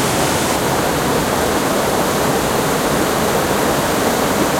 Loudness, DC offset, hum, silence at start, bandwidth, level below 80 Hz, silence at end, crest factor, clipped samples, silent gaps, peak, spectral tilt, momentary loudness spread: -16 LUFS; under 0.1%; none; 0 s; 16.5 kHz; -36 dBFS; 0 s; 14 dB; under 0.1%; none; -2 dBFS; -3.5 dB/octave; 1 LU